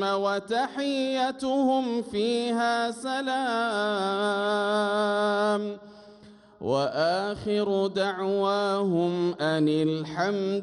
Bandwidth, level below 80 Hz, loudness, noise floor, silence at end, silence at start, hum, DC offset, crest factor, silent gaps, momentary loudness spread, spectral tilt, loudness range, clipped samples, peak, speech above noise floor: 11.5 kHz; -64 dBFS; -26 LUFS; -51 dBFS; 0 s; 0 s; none; under 0.1%; 14 dB; none; 4 LU; -5.5 dB/octave; 2 LU; under 0.1%; -12 dBFS; 26 dB